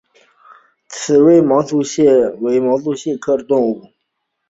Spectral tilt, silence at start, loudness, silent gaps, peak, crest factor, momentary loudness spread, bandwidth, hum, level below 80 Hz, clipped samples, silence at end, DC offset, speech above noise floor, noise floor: -6 dB/octave; 0.9 s; -14 LUFS; none; -2 dBFS; 14 dB; 11 LU; 8 kHz; none; -58 dBFS; under 0.1%; 0.7 s; under 0.1%; 59 dB; -73 dBFS